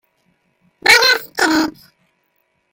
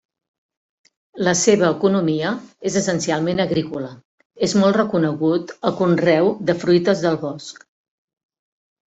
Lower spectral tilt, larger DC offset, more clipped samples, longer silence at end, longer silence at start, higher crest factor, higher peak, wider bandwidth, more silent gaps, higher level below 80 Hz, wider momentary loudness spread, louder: second, -1 dB/octave vs -5 dB/octave; neither; neither; second, 1 s vs 1.4 s; second, 0.85 s vs 1.15 s; about the same, 18 dB vs 18 dB; about the same, 0 dBFS vs -2 dBFS; first, 17 kHz vs 8.2 kHz; second, none vs 4.05-4.18 s, 4.25-4.30 s; about the same, -56 dBFS vs -60 dBFS; about the same, 9 LU vs 10 LU; first, -13 LUFS vs -19 LUFS